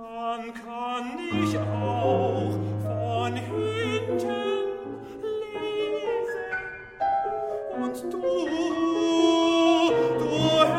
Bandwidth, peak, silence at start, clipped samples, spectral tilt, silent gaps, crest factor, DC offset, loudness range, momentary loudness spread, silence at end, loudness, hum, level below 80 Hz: 13 kHz; -6 dBFS; 0 s; under 0.1%; -6 dB/octave; none; 20 dB; under 0.1%; 6 LU; 11 LU; 0 s; -26 LUFS; none; -58 dBFS